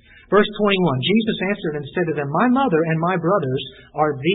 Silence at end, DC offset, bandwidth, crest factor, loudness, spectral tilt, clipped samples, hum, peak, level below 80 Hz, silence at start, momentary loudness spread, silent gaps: 0 s; under 0.1%; 4.1 kHz; 16 dB; -20 LUFS; -11.5 dB/octave; under 0.1%; none; -4 dBFS; -52 dBFS; 0.3 s; 8 LU; none